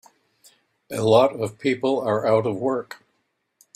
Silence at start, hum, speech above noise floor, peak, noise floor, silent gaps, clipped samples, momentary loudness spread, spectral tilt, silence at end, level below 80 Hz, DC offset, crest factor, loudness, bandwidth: 0.9 s; none; 52 dB; -4 dBFS; -72 dBFS; none; under 0.1%; 15 LU; -6 dB/octave; 0.8 s; -64 dBFS; under 0.1%; 20 dB; -21 LUFS; 13.5 kHz